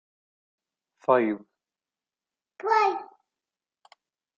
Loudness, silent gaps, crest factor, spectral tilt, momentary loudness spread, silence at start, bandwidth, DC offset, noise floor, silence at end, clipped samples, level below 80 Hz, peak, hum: -26 LUFS; none; 24 dB; -5.5 dB/octave; 13 LU; 1.1 s; 7.4 kHz; under 0.1%; under -90 dBFS; 1.3 s; under 0.1%; -82 dBFS; -8 dBFS; none